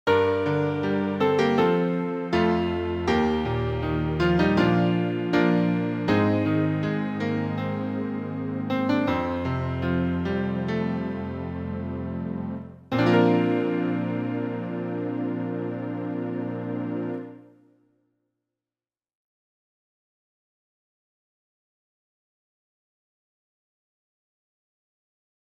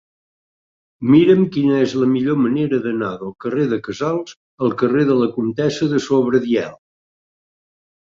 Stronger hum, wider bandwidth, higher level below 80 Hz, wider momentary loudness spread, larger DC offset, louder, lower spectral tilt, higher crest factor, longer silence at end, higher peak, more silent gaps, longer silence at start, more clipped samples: neither; about the same, 7.8 kHz vs 7.6 kHz; first, -48 dBFS vs -58 dBFS; about the same, 10 LU vs 10 LU; neither; second, -25 LUFS vs -18 LUFS; about the same, -8 dB/octave vs -7 dB/octave; about the same, 18 dB vs 16 dB; first, 8.2 s vs 1.25 s; second, -8 dBFS vs -2 dBFS; second, none vs 4.36-4.58 s; second, 0.05 s vs 1 s; neither